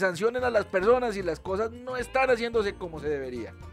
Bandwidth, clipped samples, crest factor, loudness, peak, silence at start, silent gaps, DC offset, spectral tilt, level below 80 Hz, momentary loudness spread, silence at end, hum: 13 kHz; under 0.1%; 16 dB; -27 LUFS; -10 dBFS; 0 s; none; under 0.1%; -5 dB/octave; -50 dBFS; 10 LU; 0 s; none